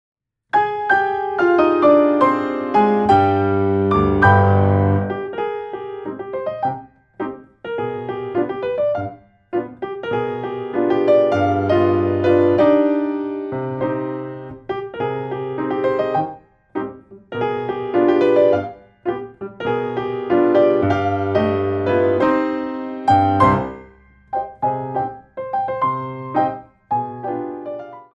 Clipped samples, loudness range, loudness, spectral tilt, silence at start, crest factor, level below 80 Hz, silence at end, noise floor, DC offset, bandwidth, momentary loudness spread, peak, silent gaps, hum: under 0.1%; 9 LU; -19 LUFS; -9 dB/octave; 0.55 s; 18 dB; -48 dBFS; 0.1 s; -47 dBFS; under 0.1%; 7.4 kHz; 15 LU; -2 dBFS; none; none